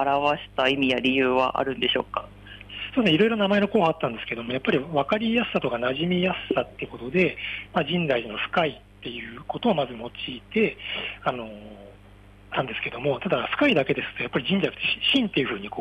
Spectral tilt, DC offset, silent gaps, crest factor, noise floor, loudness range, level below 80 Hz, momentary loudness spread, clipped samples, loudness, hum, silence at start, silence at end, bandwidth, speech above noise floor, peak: -6.5 dB/octave; under 0.1%; none; 16 dB; -49 dBFS; 6 LU; -54 dBFS; 13 LU; under 0.1%; -24 LUFS; 50 Hz at -50 dBFS; 0 s; 0 s; 9.8 kHz; 25 dB; -10 dBFS